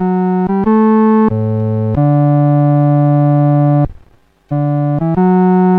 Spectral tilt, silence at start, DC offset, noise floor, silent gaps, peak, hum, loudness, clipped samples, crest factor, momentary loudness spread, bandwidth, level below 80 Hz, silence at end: -12.5 dB/octave; 0 s; under 0.1%; -47 dBFS; none; -2 dBFS; none; -12 LUFS; under 0.1%; 8 dB; 6 LU; 3.4 kHz; -38 dBFS; 0 s